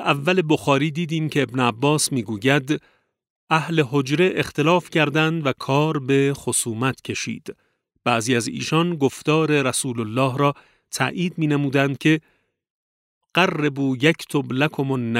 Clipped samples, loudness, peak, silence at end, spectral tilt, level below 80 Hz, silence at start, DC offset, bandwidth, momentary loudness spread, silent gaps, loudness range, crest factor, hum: under 0.1%; -21 LUFS; -2 dBFS; 0 s; -5 dB/octave; -62 dBFS; 0 s; under 0.1%; 16 kHz; 6 LU; 3.30-3.47 s, 12.70-13.21 s; 2 LU; 20 dB; none